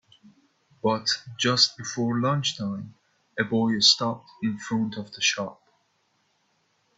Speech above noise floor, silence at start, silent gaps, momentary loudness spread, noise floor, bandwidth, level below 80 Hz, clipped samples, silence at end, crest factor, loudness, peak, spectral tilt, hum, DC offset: 44 dB; 0.85 s; none; 14 LU; -70 dBFS; 8 kHz; -68 dBFS; under 0.1%; 1.45 s; 22 dB; -24 LUFS; -4 dBFS; -3.5 dB/octave; none; under 0.1%